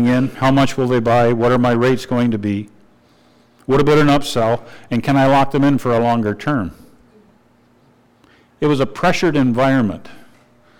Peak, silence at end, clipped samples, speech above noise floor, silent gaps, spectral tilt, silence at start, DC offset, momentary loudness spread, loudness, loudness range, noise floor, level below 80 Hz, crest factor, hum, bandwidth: -8 dBFS; 0.4 s; under 0.1%; 38 dB; none; -6.5 dB/octave; 0 s; under 0.1%; 9 LU; -16 LUFS; 5 LU; -53 dBFS; -40 dBFS; 8 dB; none; 16.5 kHz